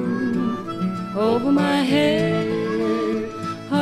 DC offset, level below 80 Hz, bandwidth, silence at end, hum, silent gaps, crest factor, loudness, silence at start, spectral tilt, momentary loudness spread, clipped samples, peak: under 0.1%; -56 dBFS; 14 kHz; 0 s; none; none; 16 dB; -21 LUFS; 0 s; -6.5 dB/octave; 8 LU; under 0.1%; -6 dBFS